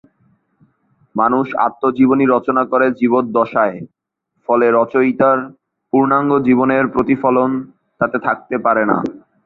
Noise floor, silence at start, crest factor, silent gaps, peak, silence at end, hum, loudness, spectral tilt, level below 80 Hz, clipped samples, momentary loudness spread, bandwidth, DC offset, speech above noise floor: -65 dBFS; 1.15 s; 14 dB; none; -2 dBFS; 0.25 s; none; -15 LUFS; -9.5 dB/octave; -56 dBFS; under 0.1%; 6 LU; 4.2 kHz; under 0.1%; 50 dB